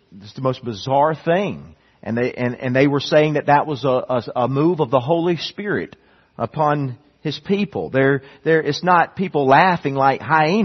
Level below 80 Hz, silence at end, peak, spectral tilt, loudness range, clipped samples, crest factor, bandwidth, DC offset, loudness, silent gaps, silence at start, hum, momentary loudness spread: -58 dBFS; 0 s; 0 dBFS; -7 dB/octave; 4 LU; under 0.1%; 18 dB; 6.4 kHz; under 0.1%; -19 LUFS; none; 0.15 s; none; 11 LU